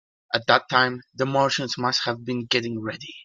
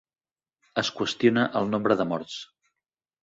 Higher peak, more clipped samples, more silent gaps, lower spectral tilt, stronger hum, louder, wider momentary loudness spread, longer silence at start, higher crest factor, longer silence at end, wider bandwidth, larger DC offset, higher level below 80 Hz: first, -2 dBFS vs -6 dBFS; neither; neither; about the same, -4 dB/octave vs -5 dB/octave; neither; about the same, -23 LUFS vs -25 LUFS; about the same, 10 LU vs 11 LU; second, 0.3 s vs 0.75 s; about the same, 22 dB vs 20 dB; second, 0 s vs 0.8 s; first, 9.4 kHz vs 8 kHz; neither; about the same, -66 dBFS vs -66 dBFS